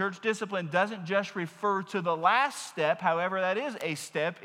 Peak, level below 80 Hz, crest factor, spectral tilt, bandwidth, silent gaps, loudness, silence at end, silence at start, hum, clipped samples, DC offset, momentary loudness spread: -10 dBFS; under -90 dBFS; 18 dB; -4.5 dB/octave; 16 kHz; none; -29 LUFS; 0 s; 0 s; none; under 0.1%; under 0.1%; 7 LU